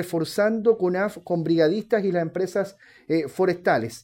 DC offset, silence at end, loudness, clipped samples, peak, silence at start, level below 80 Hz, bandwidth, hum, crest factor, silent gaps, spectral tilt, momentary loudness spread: under 0.1%; 0.05 s; -23 LUFS; under 0.1%; -6 dBFS; 0 s; -66 dBFS; 17 kHz; none; 16 dB; none; -6.5 dB/octave; 6 LU